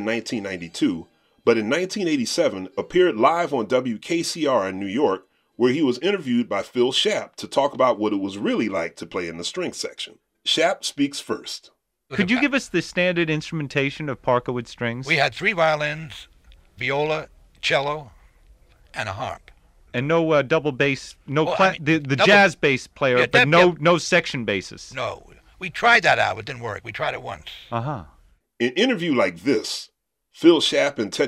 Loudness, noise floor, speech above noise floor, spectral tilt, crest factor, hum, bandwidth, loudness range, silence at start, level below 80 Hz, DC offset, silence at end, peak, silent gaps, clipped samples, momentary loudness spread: -21 LUFS; -53 dBFS; 32 dB; -4.5 dB/octave; 20 dB; none; 14.5 kHz; 7 LU; 0 s; -56 dBFS; under 0.1%; 0 s; -2 dBFS; none; under 0.1%; 14 LU